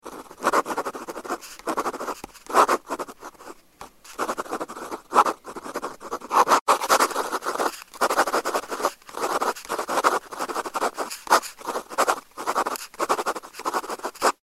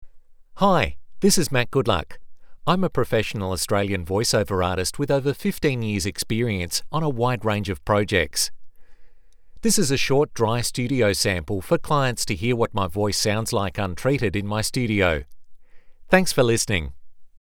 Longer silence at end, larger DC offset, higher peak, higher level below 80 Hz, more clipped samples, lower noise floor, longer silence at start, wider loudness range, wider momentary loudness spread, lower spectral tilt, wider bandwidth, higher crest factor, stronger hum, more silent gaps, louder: first, 0.25 s vs 0.05 s; neither; about the same, -2 dBFS vs 0 dBFS; second, -64 dBFS vs -42 dBFS; neither; first, -47 dBFS vs -43 dBFS; about the same, 0.05 s vs 0 s; about the same, 4 LU vs 2 LU; first, 15 LU vs 6 LU; second, -1.5 dB/octave vs -4.5 dB/octave; second, 16 kHz vs over 20 kHz; about the same, 24 dB vs 22 dB; neither; first, 6.61-6.66 s vs none; second, -25 LUFS vs -22 LUFS